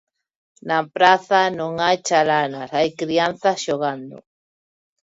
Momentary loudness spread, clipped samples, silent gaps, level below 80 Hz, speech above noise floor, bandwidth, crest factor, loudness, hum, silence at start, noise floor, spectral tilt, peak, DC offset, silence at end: 9 LU; under 0.1%; none; -64 dBFS; over 71 dB; 7.8 kHz; 20 dB; -19 LUFS; none; 0.65 s; under -90 dBFS; -3.5 dB/octave; -2 dBFS; under 0.1%; 0.85 s